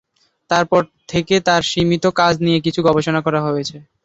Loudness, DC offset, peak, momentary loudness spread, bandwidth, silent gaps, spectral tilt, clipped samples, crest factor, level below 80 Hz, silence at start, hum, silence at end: -17 LUFS; under 0.1%; -2 dBFS; 7 LU; 8 kHz; none; -5 dB/octave; under 0.1%; 16 dB; -48 dBFS; 0.5 s; none; 0.25 s